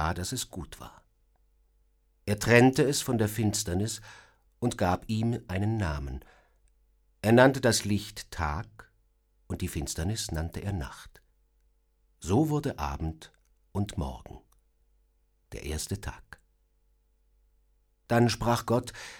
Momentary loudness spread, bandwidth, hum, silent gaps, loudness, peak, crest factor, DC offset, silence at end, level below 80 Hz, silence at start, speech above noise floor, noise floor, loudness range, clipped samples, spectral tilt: 20 LU; 18.5 kHz; none; none; -28 LUFS; -4 dBFS; 26 dB; under 0.1%; 0 s; -46 dBFS; 0 s; 41 dB; -69 dBFS; 12 LU; under 0.1%; -5 dB/octave